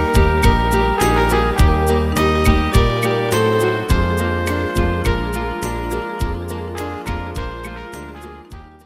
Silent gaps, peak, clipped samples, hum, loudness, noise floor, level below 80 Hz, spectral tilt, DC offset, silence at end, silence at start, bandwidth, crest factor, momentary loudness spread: none; -2 dBFS; under 0.1%; none; -18 LUFS; -38 dBFS; -22 dBFS; -6 dB/octave; under 0.1%; 0.2 s; 0 s; 16 kHz; 16 dB; 15 LU